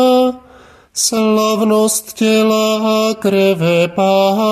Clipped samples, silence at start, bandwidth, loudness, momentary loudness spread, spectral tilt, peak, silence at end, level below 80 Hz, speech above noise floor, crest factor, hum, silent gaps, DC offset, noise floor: under 0.1%; 0 s; 15 kHz; -13 LUFS; 4 LU; -4 dB/octave; 0 dBFS; 0 s; -56 dBFS; 30 dB; 12 dB; none; none; under 0.1%; -43 dBFS